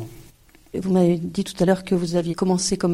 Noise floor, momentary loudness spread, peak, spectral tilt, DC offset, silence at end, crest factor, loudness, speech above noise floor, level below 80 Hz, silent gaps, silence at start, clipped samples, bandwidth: -50 dBFS; 10 LU; -4 dBFS; -6 dB/octave; under 0.1%; 0 s; 18 dB; -21 LUFS; 30 dB; -50 dBFS; none; 0 s; under 0.1%; 13.5 kHz